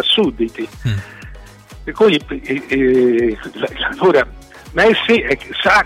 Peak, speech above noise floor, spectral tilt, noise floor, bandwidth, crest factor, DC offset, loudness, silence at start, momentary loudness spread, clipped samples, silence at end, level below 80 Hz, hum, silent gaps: -4 dBFS; 22 dB; -5.5 dB/octave; -37 dBFS; 14 kHz; 12 dB; under 0.1%; -16 LUFS; 0 s; 12 LU; under 0.1%; 0 s; -38 dBFS; none; none